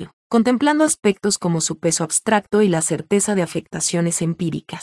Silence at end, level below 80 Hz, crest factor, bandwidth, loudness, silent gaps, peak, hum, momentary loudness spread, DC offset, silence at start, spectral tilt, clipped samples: 0 s; -58 dBFS; 16 dB; 12 kHz; -19 LUFS; 0.13-0.30 s; -2 dBFS; none; 6 LU; under 0.1%; 0 s; -4 dB/octave; under 0.1%